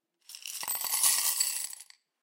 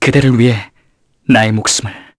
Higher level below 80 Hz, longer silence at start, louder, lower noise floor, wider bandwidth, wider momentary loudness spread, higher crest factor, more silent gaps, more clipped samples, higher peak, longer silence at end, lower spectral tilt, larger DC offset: second, -86 dBFS vs -42 dBFS; first, 0.3 s vs 0 s; second, -27 LUFS vs -12 LUFS; about the same, -52 dBFS vs -55 dBFS; first, 17 kHz vs 11 kHz; first, 20 LU vs 9 LU; first, 22 dB vs 14 dB; neither; neither; second, -10 dBFS vs 0 dBFS; first, 0.4 s vs 0.2 s; second, 4 dB/octave vs -4.5 dB/octave; neither